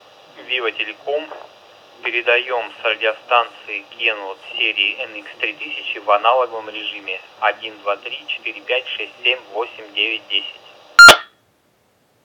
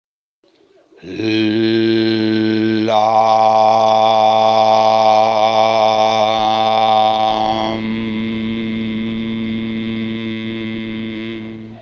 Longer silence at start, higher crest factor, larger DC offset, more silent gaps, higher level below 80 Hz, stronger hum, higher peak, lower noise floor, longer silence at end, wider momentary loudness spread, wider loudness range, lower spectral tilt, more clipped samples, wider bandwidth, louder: second, 0.4 s vs 1.05 s; about the same, 18 dB vs 14 dB; neither; neither; about the same, -54 dBFS vs -50 dBFS; neither; about the same, 0 dBFS vs 0 dBFS; about the same, -60 dBFS vs -60 dBFS; first, 1 s vs 0 s; about the same, 12 LU vs 12 LU; about the same, 9 LU vs 9 LU; second, -0.5 dB/octave vs -5.5 dB/octave; first, 0.7% vs under 0.1%; first, 18 kHz vs 7 kHz; about the same, -16 LUFS vs -15 LUFS